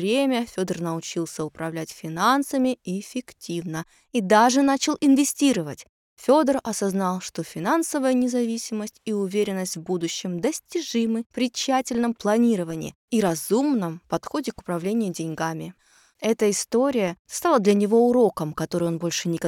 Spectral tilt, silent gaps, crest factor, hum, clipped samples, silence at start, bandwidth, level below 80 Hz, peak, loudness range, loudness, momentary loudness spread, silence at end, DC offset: -4.5 dB/octave; 5.89-6.17 s, 11.26-11.30 s, 12.95-13.08 s, 17.19-17.25 s; 18 dB; none; under 0.1%; 0 s; 17 kHz; -62 dBFS; -6 dBFS; 5 LU; -24 LUFS; 12 LU; 0 s; under 0.1%